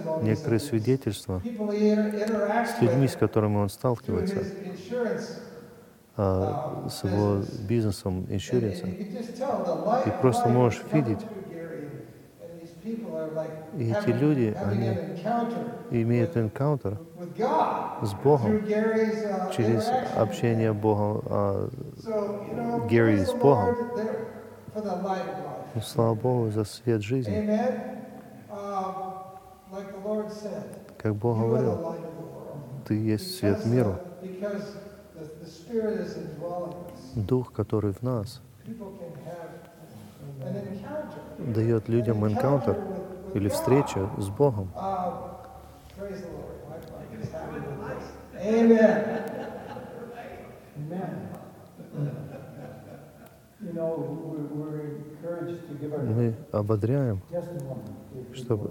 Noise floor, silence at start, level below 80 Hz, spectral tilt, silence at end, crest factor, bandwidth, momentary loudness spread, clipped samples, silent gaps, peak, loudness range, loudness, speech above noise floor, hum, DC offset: -52 dBFS; 0 s; -58 dBFS; -7.5 dB/octave; 0 s; 22 dB; 17.5 kHz; 18 LU; under 0.1%; none; -6 dBFS; 10 LU; -28 LUFS; 25 dB; none; under 0.1%